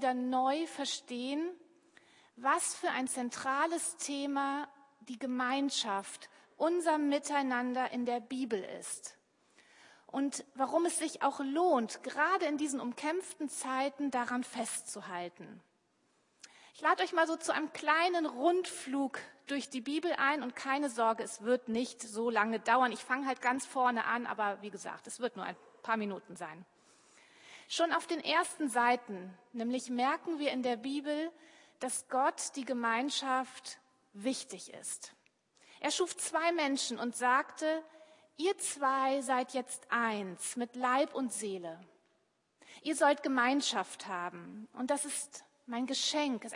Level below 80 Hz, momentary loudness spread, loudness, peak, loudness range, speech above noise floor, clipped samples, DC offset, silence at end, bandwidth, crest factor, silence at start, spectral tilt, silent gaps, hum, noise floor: under -90 dBFS; 13 LU; -34 LUFS; -14 dBFS; 5 LU; 42 dB; under 0.1%; under 0.1%; 0 s; 11.5 kHz; 22 dB; 0 s; -2 dB/octave; none; none; -76 dBFS